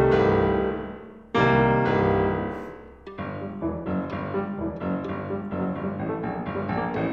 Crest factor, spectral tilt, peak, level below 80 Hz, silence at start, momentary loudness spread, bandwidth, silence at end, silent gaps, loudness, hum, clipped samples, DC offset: 18 dB; -8.5 dB/octave; -8 dBFS; -44 dBFS; 0 s; 15 LU; 7.2 kHz; 0 s; none; -26 LUFS; none; under 0.1%; under 0.1%